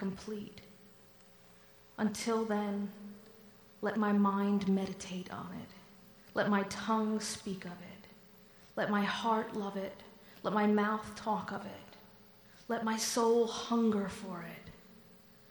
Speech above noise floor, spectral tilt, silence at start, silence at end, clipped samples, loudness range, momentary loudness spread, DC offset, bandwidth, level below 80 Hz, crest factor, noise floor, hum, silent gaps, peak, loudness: 26 dB; -5 dB/octave; 0 s; 0.35 s; under 0.1%; 4 LU; 22 LU; under 0.1%; over 20 kHz; -70 dBFS; 16 dB; -60 dBFS; none; none; -18 dBFS; -34 LUFS